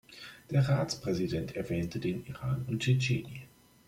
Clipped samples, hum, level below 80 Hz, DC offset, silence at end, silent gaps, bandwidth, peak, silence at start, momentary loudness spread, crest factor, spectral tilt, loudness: under 0.1%; none; -58 dBFS; under 0.1%; 0.4 s; none; 15.5 kHz; -16 dBFS; 0.1 s; 15 LU; 16 dB; -6 dB/octave; -32 LUFS